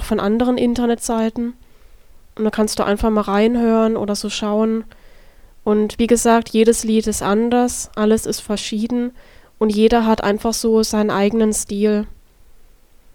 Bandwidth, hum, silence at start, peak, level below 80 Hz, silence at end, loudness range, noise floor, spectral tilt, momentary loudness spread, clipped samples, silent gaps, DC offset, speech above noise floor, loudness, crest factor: 17.5 kHz; none; 0 s; 0 dBFS; -38 dBFS; 1.05 s; 2 LU; -47 dBFS; -4.5 dB/octave; 8 LU; under 0.1%; none; under 0.1%; 30 dB; -18 LUFS; 18 dB